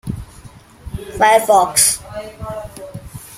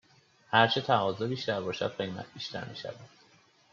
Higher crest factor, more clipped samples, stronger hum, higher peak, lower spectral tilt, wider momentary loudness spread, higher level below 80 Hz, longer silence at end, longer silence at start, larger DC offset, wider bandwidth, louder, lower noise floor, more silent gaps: second, 18 dB vs 24 dB; neither; neither; first, 0 dBFS vs -8 dBFS; second, -2 dB/octave vs -5 dB/octave; first, 22 LU vs 16 LU; first, -40 dBFS vs -74 dBFS; second, 0 s vs 0.65 s; second, 0.05 s vs 0.5 s; neither; first, 16.5 kHz vs 7.4 kHz; first, -13 LUFS vs -30 LUFS; second, -41 dBFS vs -63 dBFS; neither